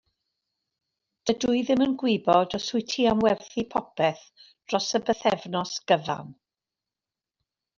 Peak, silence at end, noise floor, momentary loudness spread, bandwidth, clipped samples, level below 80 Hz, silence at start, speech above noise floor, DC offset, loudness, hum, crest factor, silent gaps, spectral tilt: -6 dBFS; 1.45 s; under -90 dBFS; 8 LU; 7.4 kHz; under 0.1%; -62 dBFS; 1.25 s; over 65 dB; under 0.1%; -25 LUFS; none; 20 dB; none; -4.5 dB/octave